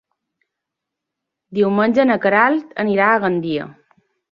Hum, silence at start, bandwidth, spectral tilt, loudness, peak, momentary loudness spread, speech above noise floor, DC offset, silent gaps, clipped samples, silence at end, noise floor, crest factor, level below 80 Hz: none; 1.5 s; 6.8 kHz; -8 dB/octave; -17 LUFS; -2 dBFS; 11 LU; 66 dB; under 0.1%; none; under 0.1%; 0.6 s; -82 dBFS; 18 dB; -64 dBFS